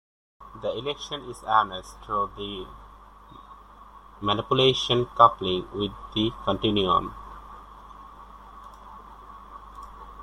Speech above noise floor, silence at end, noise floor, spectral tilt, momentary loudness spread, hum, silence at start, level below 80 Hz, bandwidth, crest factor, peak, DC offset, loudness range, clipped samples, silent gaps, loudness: 24 dB; 0 s; -48 dBFS; -5.5 dB/octave; 25 LU; 50 Hz at -50 dBFS; 0.4 s; -50 dBFS; 12.5 kHz; 26 dB; -2 dBFS; under 0.1%; 7 LU; under 0.1%; none; -25 LUFS